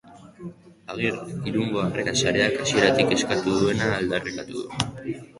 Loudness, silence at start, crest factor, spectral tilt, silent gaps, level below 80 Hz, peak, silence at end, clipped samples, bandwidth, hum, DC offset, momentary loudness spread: -23 LUFS; 0.05 s; 22 dB; -4 dB/octave; none; -52 dBFS; -2 dBFS; 0.15 s; under 0.1%; 11.5 kHz; none; under 0.1%; 15 LU